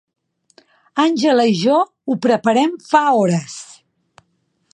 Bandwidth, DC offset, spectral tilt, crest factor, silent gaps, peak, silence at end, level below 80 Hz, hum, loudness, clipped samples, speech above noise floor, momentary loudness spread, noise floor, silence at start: 11 kHz; under 0.1%; -5.5 dB/octave; 18 dB; none; 0 dBFS; 1.1 s; -68 dBFS; none; -16 LUFS; under 0.1%; 50 dB; 9 LU; -66 dBFS; 0.95 s